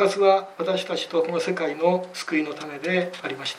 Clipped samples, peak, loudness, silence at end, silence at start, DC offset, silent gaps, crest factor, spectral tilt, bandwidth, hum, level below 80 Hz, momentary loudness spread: under 0.1%; -6 dBFS; -24 LUFS; 0 s; 0 s; under 0.1%; none; 18 dB; -4.5 dB/octave; 15 kHz; none; -78 dBFS; 10 LU